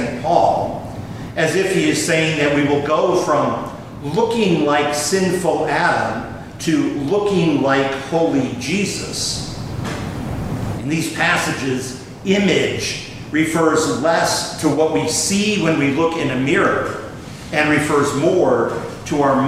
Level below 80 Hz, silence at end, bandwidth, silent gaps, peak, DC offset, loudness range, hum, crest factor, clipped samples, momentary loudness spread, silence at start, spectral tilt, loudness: -44 dBFS; 0 s; 16 kHz; none; 0 dBFS; under 0.1%; 4 LU; none; 16 dB; under 0.1%; 10 LU; 0 s; -4.5 dB/octave; -18 LUFS